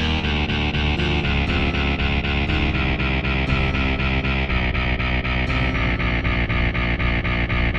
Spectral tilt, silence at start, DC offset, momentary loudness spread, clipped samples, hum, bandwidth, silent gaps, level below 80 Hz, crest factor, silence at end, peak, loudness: -6.5 dB/octave; 0 s; under 0.1%; 1 LU; under 0.1%; none; 7 kHz; none; -24 dBFS; 14 dB; 0 s; -8 dBFS; -21 LUFS